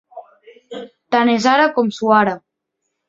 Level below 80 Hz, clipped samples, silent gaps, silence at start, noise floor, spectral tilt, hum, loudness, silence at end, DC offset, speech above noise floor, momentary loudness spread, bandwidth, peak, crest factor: -64 dBFS; under 0.1%; none; 0.15 s; -75 dBFS; -5 dB/octave; none; -15 LUFS; 0.7 s; under 0.1%; 61 dB; 20 LU; 7.8 kHz; -2 dBFS; 18 dB